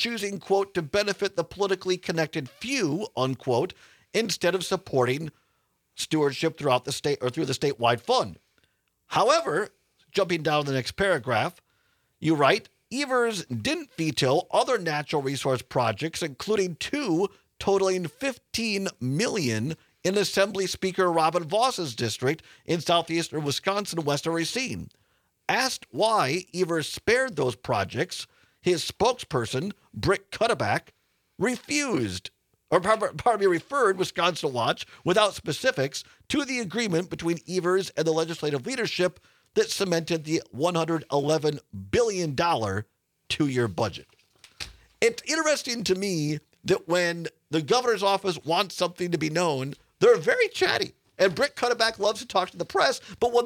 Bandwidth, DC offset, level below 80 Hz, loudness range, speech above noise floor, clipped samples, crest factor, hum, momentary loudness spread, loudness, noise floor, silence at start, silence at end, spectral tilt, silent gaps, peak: 18.5 kHz; under 0.1%; -60 dBFS; 3 LU; 46 dB; under 0.1%; 22 dB; none; 8 LU; -26 LUFS; -72 dBFS; 0 s; 0 s; -4 dB/octave; none; -4 dBFS